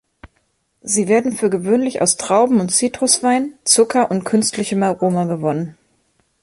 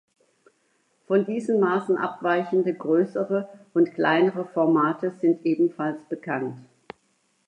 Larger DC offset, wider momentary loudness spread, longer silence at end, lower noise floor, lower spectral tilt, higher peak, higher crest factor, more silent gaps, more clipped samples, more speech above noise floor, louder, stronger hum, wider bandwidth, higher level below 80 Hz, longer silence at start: neither; second, 6 LU vs 9 LU; second, 0.7 s vs 0.85 s; about the same, -65 dBFS vs -68 dBFS; second, -4 dB/octave vs -7.5 dB/octave; first, 0 dBFS vs -6 dBFS; about the same, 18 dB vs 18 dB; neither; neither; first, 49 dB vs 45 dB; first, -16 LUFS vs -24 LUFS; neither; first, 12 kHz vs 9.4 kHz; first, -58 dBFS vs -78 dBFS; second, 0.25 s vs 1.1 s